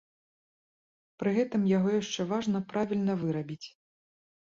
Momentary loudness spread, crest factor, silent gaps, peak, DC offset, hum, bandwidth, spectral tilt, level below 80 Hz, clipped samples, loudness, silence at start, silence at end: 11 LU; 16 dB; none; -16 dBFS; under 0.1%; none; 7.6 kHz; -6.5 dB/octave; -70 dBFS; under 0.1%; -30 LUFS; 1.2 s; 0.85 s